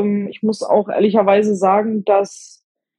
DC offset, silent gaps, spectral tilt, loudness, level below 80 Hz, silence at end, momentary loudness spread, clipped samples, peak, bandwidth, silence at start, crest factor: under 0.1%; none; -6.5 dB/octave; -16 LUFS; -64 dBFS; 0.55 s; 7 LU; under 0.1%; -2 dBFS; 10.5 kHz; 0 s; 14 dB